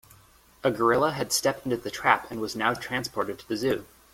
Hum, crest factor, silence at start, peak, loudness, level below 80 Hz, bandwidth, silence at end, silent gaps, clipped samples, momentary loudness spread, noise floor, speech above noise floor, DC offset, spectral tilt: none; 24 dB; 0.65 s; -4 dBFS; -27 LUFS; -58 dBFS; 16.5 kHz; 0.3 s; none; under 0.1%; 8 LU; -57 dBFS; 30 dB; under 0.1%; -3.5 dB/octave